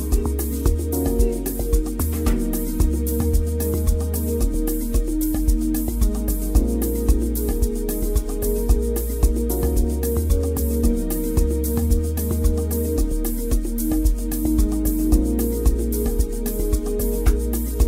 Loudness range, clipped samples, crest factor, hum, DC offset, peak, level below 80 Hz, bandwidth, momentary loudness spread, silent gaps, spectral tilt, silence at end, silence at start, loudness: 1 LU; under 0.1%; 16 dB; none; under 0.1%; -4 dBFS; -22 dBFS; 16.5 kHz; 3 LU; none; -6.5 dB/octave; 0 s; 0 s; -22 LUFS